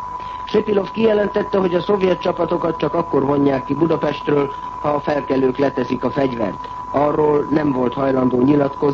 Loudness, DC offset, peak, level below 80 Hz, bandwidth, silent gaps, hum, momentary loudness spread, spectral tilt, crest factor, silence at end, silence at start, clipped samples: -18 LUFS; under 0.1%; -4 dBFS; -46 dBFS; 7.2 kHz; none; none; 5 LU; -8 dB/octave; 14 dB; 0 s; 0 s; under 0.1%